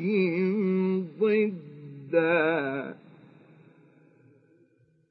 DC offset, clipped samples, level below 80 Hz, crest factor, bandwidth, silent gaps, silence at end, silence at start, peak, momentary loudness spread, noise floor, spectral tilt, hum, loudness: under 0.1%; under 0.1%; -86 dBFS; 18 dB; 5 kHz; none; 2.15 s; 0 s; -10 dBFS; 18 LU; -64 dBFS; -10.5 dB/octave; none; -26 LUFS